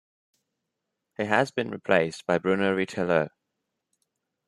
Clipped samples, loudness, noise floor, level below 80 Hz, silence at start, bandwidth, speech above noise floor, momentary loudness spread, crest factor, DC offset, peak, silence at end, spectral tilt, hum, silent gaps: under 0.1%; -26 LUFS; -83 dBFS; -70 dBFS; 1.2 s; 12 kHz; 58 dB; 9 LU; 22 dB; under 0.1%; -6 dBFS; 1.2 s; -6 dB/octave; none; none